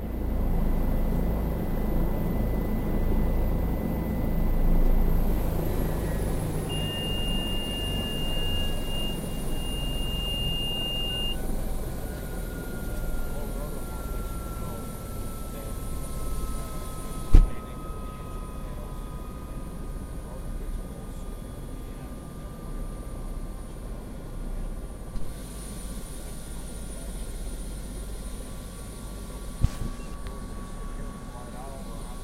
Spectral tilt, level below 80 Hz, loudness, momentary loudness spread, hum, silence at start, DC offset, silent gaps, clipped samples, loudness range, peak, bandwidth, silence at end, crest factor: -5 dB/octave; -30 dBFS; -32 LUFS; 12 LU; none; 0 s; under 0.1%; none; under 0.1%; 10 LU; 0 dBFS; 16 kHz; 0 s; 28 dB